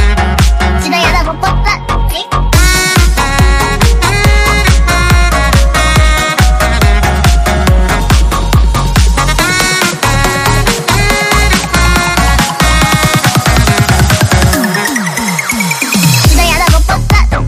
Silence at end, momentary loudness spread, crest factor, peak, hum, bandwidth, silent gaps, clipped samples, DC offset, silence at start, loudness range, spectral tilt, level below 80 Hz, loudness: 0 s; 4 LU; 8 dB; 0 dBFS; none; 16 kHz; none; 0.3%; under 0.1%; 0 s; 1 LU; -4 dB/octave; -12 dBFS; -9 LUFS